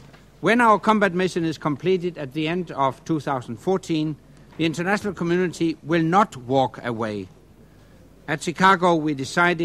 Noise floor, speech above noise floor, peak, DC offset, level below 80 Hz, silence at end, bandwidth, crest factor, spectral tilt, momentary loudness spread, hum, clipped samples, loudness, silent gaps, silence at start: -50 dBFS; 28 dB; -4 dBFS; under 0.1%; -56 dBFS; 0 s; 13.5 kHz; 20 dB; -6 dB/octave; 11 LU; none; under 0.1%; -22 LUFS; none; 0 s